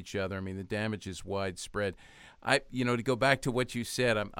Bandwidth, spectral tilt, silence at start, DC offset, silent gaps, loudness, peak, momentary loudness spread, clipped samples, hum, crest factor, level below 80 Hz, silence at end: 16.5 kHz; -4.5 dB/octave; 0 s; under 0.1%; none; -32 LUFS; -10 dBFS; 10 LU; under 0.1%; none; 22 dB; -56 dBFS; 0 s